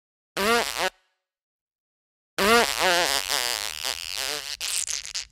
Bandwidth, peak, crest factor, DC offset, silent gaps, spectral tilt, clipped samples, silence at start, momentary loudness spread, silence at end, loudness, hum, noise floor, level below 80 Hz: 17 kHz; -4 dBFS; 22 dB; under 0.1%; 1.42-1.67 s, 1.75-2.37 s; -0.5 dB/octave; under 0.1%; 0.35 s; 10 LU; 0.1 s; -24 LUFS; none; -70 dBFS; -54 dBFS